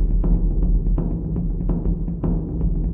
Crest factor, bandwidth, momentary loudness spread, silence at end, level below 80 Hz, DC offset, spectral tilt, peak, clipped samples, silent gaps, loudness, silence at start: 12 dB; 1.5 kHz; 3 LU; 0 s; -20 dBFS; under 0.1%; -14.5 dB/octave; -6 dBFS; under 0.1%; none; -24 LUFS; 0 s